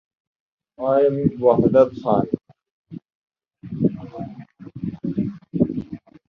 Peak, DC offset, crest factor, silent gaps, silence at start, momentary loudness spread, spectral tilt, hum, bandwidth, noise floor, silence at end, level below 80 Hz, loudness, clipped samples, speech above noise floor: -2 dBFS; under 0.1%; 20 dB; 2.71-2.84 s, 3.15-3.28 s; 0.8 s; 24 LU; -11 dB/octave; none; 6 kHz; -39 dBFS; 0.3 s; -52 dBFS; -21 LUFS; under 0.1%; 22 dB